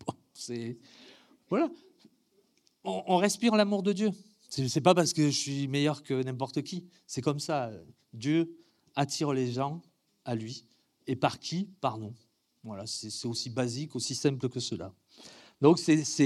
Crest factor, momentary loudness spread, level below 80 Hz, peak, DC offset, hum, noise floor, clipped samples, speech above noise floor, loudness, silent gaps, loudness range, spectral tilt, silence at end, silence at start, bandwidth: 24 dB; 19 LU; -76 dBFS; -8 dBFS; under 0.1%; none; -70 dBFS; under 0.1%; 40 dB; -30 LUFS; none; 7 LU; -5 dB/octave; 0 s; 0.05 s; 14 kHz